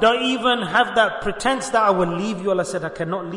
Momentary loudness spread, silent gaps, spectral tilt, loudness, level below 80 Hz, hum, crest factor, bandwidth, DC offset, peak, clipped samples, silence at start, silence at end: 8 LU; none; -4 dB/octave; -20 LUFS; -48 dBFS; none; 16 dB; 11 kHz; under 0.1%; -4 dBFS; under 0.1%; 0 s; 0 s